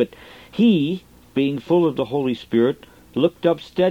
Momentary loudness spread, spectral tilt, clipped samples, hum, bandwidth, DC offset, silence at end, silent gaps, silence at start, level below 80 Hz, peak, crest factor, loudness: 12 LU; -8 dB/octave; under 0.1%; none; 15 kHz; under 0.1%; 0 s; none; 0 s; -56 dBFS; -4 dBFS; 16 dB; -21 LUFS